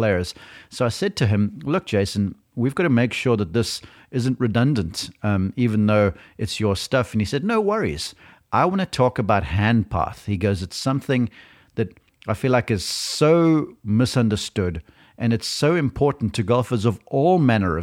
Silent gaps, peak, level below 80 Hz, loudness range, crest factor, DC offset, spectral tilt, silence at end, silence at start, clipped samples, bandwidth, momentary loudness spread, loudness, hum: none; -4 dBFS; -46 dBFS; 2 LU; 16 dB; under 0.1%; -6 dB/octave; 0 s; 0 s; under 0.1%; 16 kHz; 10 LU; -22 LUFS; none